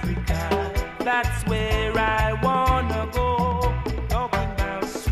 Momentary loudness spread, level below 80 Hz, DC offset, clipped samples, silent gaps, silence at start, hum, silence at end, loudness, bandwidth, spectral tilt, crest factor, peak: 5 LU; -28 dBFS; under 0.1%; under 0.1%; none; 0 s; none; 0 s; -24 LUFS; 15.5 kHz; -5.5 dB/octave; 16 dB; -8 dBFS